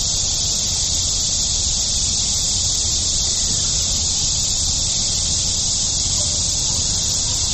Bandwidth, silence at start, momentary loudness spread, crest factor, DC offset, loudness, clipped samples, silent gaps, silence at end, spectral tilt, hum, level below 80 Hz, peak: 14 kHz; 0 s; 1 LU; 14 dB; under 0.1%; -16 LUFS; under 0.1%; none; 0 s; -1 dB/octave; none; -30 dBFS; -6 dBFS